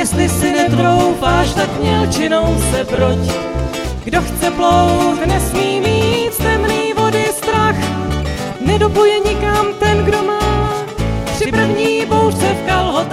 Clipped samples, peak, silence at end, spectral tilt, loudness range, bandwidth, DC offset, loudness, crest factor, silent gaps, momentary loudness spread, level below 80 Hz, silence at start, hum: under 0.1%; 0 dBFS; 0 s; -5 dB/octave; 1 LU; 16 kHz; under 0.1%; -15 LUFS; 14 dB; none; 7 LU; -26 dBFS; 0 s; none